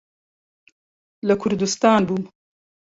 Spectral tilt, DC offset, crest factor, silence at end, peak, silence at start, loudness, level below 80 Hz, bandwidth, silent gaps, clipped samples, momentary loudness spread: -5 dB/octave; under 0.1%; 20 dB; 0.6 s; -2 dBFS; 1.25 s; -20 LUFS; -58 dBFS; 8 kHz; none; under 0.1%; 11 LU